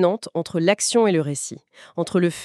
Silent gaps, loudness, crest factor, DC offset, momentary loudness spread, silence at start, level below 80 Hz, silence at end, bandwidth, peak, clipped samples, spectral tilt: none; -21 LUFS; 16 dB; under 0.1%; 15 LU; 0 s; -68 dBFS; 0 s; 13.5 kHz; -4 dBFS; under 0.1%; -4.5 dB/octave